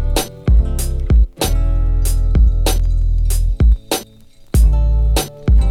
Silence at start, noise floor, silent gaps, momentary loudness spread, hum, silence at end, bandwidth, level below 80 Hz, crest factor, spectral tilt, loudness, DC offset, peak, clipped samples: 0 s; -42 dBFS; none; 5 LU; none; 0 s; 16 kHz; -14 dBFS; 12 dB; -5.5 dB/octave; -17 LUFS; under 0.1%; 0 dBFS; under 0.1%